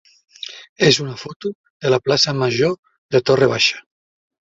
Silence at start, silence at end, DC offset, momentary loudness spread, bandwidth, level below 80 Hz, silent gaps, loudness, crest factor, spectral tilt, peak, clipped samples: 0.45 s; 0.7 s; under 0.1%; 17 LU; 7.8 kHz; -56 dBFS; 0.69-0.76 s, 1.36-1.40 s, 1.55-1.64 s, 1.70-1.80 s, 2.79-2.83 s, 2.98-3.09 s; -17 LUFS; 18 dB; -4 dB/octave; 0 dBFS; under 0.1%